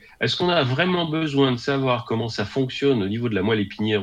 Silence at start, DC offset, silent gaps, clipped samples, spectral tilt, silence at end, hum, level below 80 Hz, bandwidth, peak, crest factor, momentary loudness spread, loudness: 0.2 s; under 0.1%; none; under 0.1%; -6.5 dB/octave; 0 s; none; -56 dBFS; 9.4 kHz; -4 dBFS; 18 dB; 5 LU; -22 LUFS